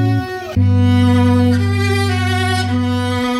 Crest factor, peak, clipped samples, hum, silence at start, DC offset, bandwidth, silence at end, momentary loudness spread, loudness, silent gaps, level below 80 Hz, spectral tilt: 12 dB; -2 dBFS; under 0.1%; none; 0 s; under 0.1%; 12.5 kHz; 0 s; 5 LU; -15 LUFS; none; -42 dBFS; -6.5 dB/octave